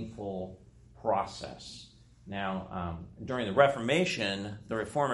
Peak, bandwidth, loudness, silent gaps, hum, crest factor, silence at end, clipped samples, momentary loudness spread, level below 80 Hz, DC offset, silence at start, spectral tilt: -8 dBFS; 11.5 kHz; -32 LUFS; none; none; 24 dB; 0 s; under 0.1%; 17 LU; -58 dBFS; under 0.1%; 0 s; -5 dB/octave